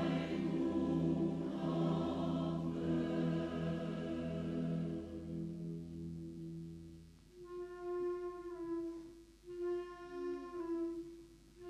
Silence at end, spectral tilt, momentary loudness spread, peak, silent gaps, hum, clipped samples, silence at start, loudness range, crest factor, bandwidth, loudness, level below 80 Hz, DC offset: 0 s; -8.5 dB/octave; 16 LU; -24 dBFS; none; none; under 0.1%; 0 s; 9 LU; 16 dB; 9.8 kHz; -40 LUFS; -62 dBFS; under 0.1%